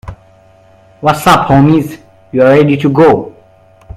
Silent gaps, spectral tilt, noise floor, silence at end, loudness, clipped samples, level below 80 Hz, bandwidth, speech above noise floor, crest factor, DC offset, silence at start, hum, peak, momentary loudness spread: none; -7 dB/octave; -43 dBFS; 0.65 s; -9 LUFS; 0.3%; -38 dBFS; 16 kHz; 36 dB; 10 dB; under 0.1%; 0.05 s; none; 0 dBFS; 11 LU